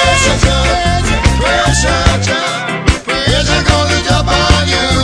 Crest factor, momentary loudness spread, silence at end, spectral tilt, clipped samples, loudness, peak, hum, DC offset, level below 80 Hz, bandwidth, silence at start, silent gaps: 12 dB; 4 LU; 0 s; -4 dB/octave; 0.1%; -11 LUFS; 0 dBFS; none; under 0.1%; -18 dBFS; 11 kHz; 0 s; none